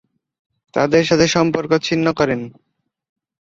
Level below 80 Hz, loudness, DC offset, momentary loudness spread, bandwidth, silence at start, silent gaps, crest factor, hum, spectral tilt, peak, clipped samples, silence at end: -52 dBFS; -17 LUFS; under 0.1%; 11 LU; 7.8 kHz; 0.75 s; none; 18 dB; none; -5 dB/octave; 0 dBFS; under 0.1%; 0.9 s